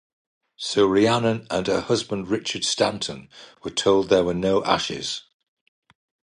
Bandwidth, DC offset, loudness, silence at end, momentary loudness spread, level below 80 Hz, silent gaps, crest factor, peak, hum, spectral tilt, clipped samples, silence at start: 11 kHz; under 0.1%; -22 LUFS; 1.2 s; 12 LU; -54 dBFS; none; 20 dB; -4 dBFS; none; -4 dB/octave; under 0.1%; 0.6 s